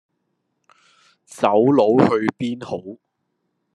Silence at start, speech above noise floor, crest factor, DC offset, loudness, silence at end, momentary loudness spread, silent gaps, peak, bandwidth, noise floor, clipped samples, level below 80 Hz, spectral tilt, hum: 1.35 s; 56 dB; 20 dB; under 0.1%; -18 LUFS; 0.8 s; 16 LU; none; 0 dBFS; 12 kHz; -73 dBFS; under 0.1%; -66 dBFS; -7 dB/octave; none